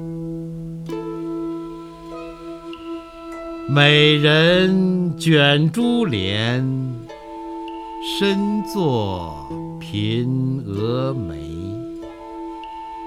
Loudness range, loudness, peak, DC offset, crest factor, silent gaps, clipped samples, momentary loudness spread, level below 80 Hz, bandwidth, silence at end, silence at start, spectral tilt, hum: 9 LU; -19 LUFS; 0 dBFS; under 0.1%; 20 dB; none; under 0.1%; 20 LU; -48 dBFS; 14.5 kHz; 0 s; 0 s; -6 dB/octave; none